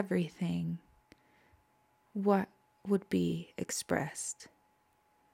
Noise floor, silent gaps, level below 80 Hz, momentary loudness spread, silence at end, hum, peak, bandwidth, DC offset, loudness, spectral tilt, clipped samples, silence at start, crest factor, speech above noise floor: -72 dBFS; none; -70 dBFS; 14 LU; 0.85 s; none; -16 dBFS; 16 kHz; under 0.1%; -35 LUFS; -5.5 dB/octave; under 0.1%; 0 s; 20 dB; 38 dB